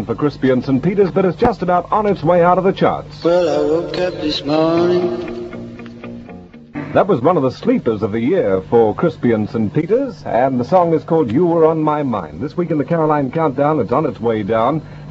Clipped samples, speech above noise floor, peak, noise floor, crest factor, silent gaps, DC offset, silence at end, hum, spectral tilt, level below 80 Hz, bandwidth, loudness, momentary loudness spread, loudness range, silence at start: under 0.1%; 21 dB; 0 dBFS; -36 dBFS; 16 dB; none; under 0.1%; 0 s; none; -8 dB/octave; -44 dBFS; 7.6 kHz; -16 LUFS; 11 LU; 4 LU; 0 s